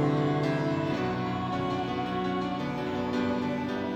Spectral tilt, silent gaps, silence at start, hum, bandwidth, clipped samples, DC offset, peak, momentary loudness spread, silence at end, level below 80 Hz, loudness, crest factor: -7.5 dB/octave; none; 0 s; none; 9 kHz; under 0.1%; under 0.1%; -16 dBFS; 4 LU; 0 s; -56 dBFS; -30 LUFS; 12 dB